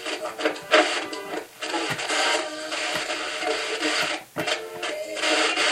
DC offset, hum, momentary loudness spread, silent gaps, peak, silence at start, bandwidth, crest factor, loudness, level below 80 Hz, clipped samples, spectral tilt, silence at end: under 0.1%; none; 10 LU; none; -4 dBFS; 0 s; 16 kHz; 22 dB; -25 LUFS; -70 dBFS; under 0.1%; -1 dB/octave; 0 s